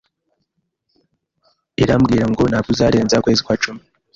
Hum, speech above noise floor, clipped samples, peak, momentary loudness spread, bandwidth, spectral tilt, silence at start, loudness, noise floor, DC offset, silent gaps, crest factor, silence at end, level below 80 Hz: none; 56 dB; under 0.1%; -2 dBFS; 8 LU; 7.6 kHz; -5.5 dB/octave; 1.8 s; -16 LUFS; -71 dBFS; under 0.1%; none; 16 dB; 0.35 s; -40 dBFS